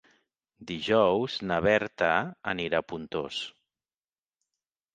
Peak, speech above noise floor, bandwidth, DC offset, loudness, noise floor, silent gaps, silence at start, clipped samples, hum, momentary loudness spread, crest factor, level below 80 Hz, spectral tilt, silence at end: -8 dBFS; over 62 dB; 9.2 kHz; under 0.1%; -28 LUFS; under -90 dBFS; none; 0.6 s; under 0.1%; none; 11 LU; 22 dB; -60 dBFS; -5.5 dB/octave; 1.45 s